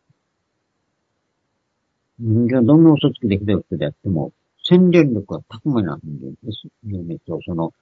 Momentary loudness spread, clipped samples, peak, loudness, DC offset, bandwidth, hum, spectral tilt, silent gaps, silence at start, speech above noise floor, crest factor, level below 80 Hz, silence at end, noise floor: 19 LU; under 0.1%; 0 dBFS; -18 LUFS; under 0.1%; 6.2 kHz; none; -9 dB/octave; none; 2.2 s; 55 dB; 18 dB; -54 dBFS; 0.1 s; -72 dBFS